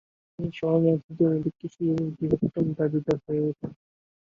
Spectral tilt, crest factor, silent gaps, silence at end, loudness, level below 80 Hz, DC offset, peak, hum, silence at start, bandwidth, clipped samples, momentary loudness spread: -10 dB/octave; 18 dB; 1.04-1.09 s; 0.6 s; -26 LUFS; -58 dBFS; under 0.1%; -8 dBFS; none; 0.4 s; 7.2 kHz; under 0.1%; 11 LU